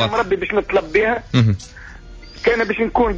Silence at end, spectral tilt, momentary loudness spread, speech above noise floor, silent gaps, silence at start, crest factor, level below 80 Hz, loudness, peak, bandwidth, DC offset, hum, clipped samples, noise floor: 0 s; -6.5 dB/octave; 14 LU; 20 dB; none; 0 s; 14 dB; -36 dBFS; -18 LUFS; -4 dBFS; 8 kHz; under 0.1%; none; under 0.1%; -37 dBFS